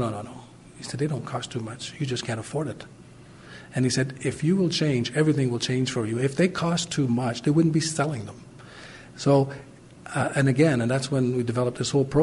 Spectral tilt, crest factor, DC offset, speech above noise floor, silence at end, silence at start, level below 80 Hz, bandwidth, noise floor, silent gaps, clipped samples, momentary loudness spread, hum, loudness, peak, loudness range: -5.5 dB/octave; 18 dB; under 0.1%; 23 dB; 0 s; 0 s; -56 dBFS; 11.5 kHz; -47 dBFS; none; under 0.1%; 20 LU; none; -25 LUFS; -8 dBFS; 6 LU